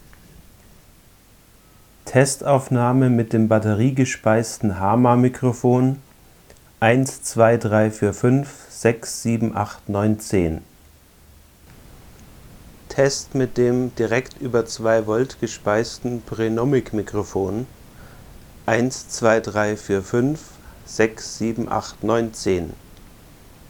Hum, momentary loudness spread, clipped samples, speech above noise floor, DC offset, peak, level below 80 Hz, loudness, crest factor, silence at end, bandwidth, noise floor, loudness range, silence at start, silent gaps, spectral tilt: none; 8 LU; under 0.1%; 31 dB; under 0.1%; -2 dBFS; -48 dBFS; -20 LUFS; 20 dB; 0.65 s; 20 kHz; -51 dBFS; 6 LU; 2.05 s; none; -6 dB/octave